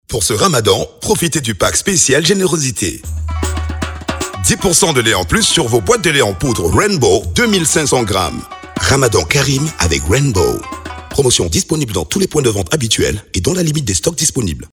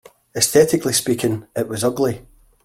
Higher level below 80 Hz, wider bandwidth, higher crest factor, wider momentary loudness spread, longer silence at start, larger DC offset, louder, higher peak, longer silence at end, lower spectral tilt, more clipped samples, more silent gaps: first, -30 dBFS vs -52 dBFS; first, over 20 kHz vs 16.5 kHz; about the same, 14 dB vs 18 dB; about the same, 9 LU vs 11 LU; second, 0.1 s vs 0.35 s; neither; first, -13 LUFS vs -18 LUFS; about the same, 0 dBFS vs -2 dBFS; second, 0.05 s vs 0.4 s; about the same, -3.5 dB/octave vs -4 dB/octave; neither; neither